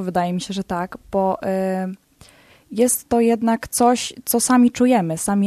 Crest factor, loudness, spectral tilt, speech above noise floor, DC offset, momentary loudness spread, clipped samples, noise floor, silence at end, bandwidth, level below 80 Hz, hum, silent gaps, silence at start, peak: 16 dB; -19 LUFS; -4.5 dB/octave; 31 dB; under 0.1%; 11 LU; under 0.1%; -50 dBFS; 0 s; 14 kHz; -52 dBFS; none; none; 0 s; -4 dBFS